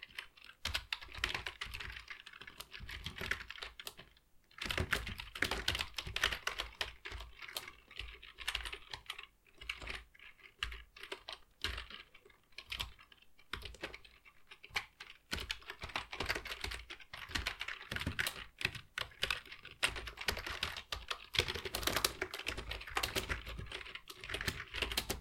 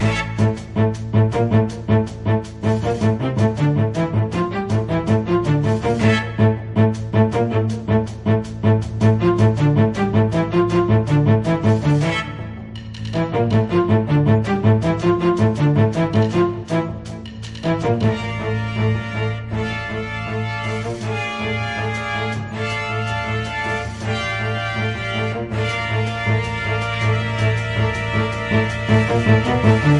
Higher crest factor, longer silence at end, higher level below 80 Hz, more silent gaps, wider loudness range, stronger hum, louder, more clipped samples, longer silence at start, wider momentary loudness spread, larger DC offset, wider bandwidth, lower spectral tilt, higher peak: first, 30 dB vs 16 dB; about the same, 0 s vs 0 s; second, -54 dBFS vs -40 dBFS; neither; about the same, 8 LU vs 6 LU; neither; second, -41 LUFS vs -19 LUFS; neither; about the same, 0 s vs 0 s; first, 14 LU vs 8 LU; neither; first, 16.5 kHz vs 10.5 kHz; second, -2 dB/octave vs -7.5 dB/octave; second, -12 dBFS vs -2 dBFS